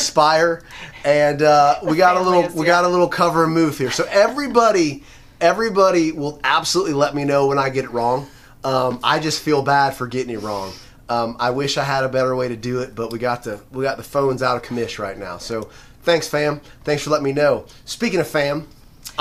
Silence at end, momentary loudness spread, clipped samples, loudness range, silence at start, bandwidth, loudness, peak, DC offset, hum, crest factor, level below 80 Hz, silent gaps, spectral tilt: 0 s; 13 LU; under 0.1%; 6 LU; 0 s; 15.5 kHz; -18 LUFS; 0 dBFS; under 0.1%; none; 18 dB; -48 dBFS; none; -4.5 dB/octave